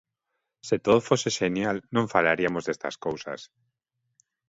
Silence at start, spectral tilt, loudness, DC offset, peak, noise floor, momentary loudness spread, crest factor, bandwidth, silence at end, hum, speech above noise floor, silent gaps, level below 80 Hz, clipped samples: 0.65 s; -4.5 dB/octave; -26 LUFS; under 0.1%; -4 dBFS; -82 dBFS; 13 LU; 22 dB; 8 kHz; 1.05 s; none; 56 dB; none; -62 dBFS; under 0.1%